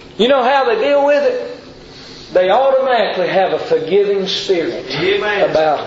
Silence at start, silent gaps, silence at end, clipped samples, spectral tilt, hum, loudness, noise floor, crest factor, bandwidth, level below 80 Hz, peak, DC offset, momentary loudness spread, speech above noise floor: 0 s; none; 0 s; under 0.1%; -4.5 dB/octave; none; -14 LUFS; -36 dBFS; 14 dB; 7.8 kHz; -52 dBFS; -2 dBFS; under 0.1%; 8 LU; 22 dB